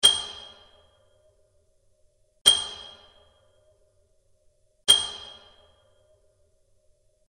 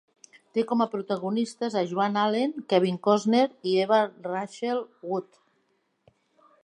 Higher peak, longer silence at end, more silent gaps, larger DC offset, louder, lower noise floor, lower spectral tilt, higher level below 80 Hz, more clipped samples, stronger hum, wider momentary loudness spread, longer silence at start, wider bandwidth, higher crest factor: first, -2 dBFS vs -8 dBFS; first, 2.1 s vs 1.4 s; first, 2.41-2.45 s vs none; neither; first, -21 LUFS vs -26 LUFS; second, -65 dBFS vs -72 dBFS; second, 1.5 dB/octave vs -6 dB/octave; first, -62 dBFS vs -80 dBFS; neither; neither; first, 25 LU vs 10 LU; second, 0.05 s vs 0.55 s; first, 12 kHz vs 10.5 kHz; first, 28 dB vs 20 dB